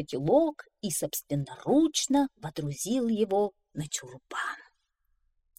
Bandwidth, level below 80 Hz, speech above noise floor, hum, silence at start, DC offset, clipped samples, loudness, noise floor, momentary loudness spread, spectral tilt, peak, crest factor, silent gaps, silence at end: 16.5 kHz; -62 dBFS; 45 dB; none; 0 s; under 0.1%; under 0.1%; -29 LUFS; -74 dBFS; 11 LU; -4.5 dB/octave; -12 dBFS; 18 dB; none; 0.95 s